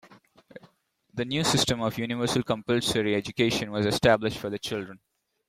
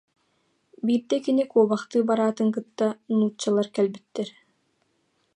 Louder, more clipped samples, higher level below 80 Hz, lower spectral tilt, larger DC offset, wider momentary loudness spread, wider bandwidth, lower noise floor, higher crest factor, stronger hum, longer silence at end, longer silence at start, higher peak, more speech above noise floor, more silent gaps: about the same, -26 LUFS vs -25 LUFS; neither; first, -54 dBFS vs -78 dBFS; second, -4.5 dB/octave vs -6 dB/octave; neither; about the same, 10 LU vs 10 LU; first, 16.5 kHz vs 10 kHz; second, -63 dBFS vs -70 dBFS; about the same, 20 dB vs 18 dB; neither; second, 0.5 s vs 1.05 s; second, 0.1 s vs 0.85 s; about the same, -8 dBFS vs -8 dBFS; second, 37 dB vs 47 dB; neither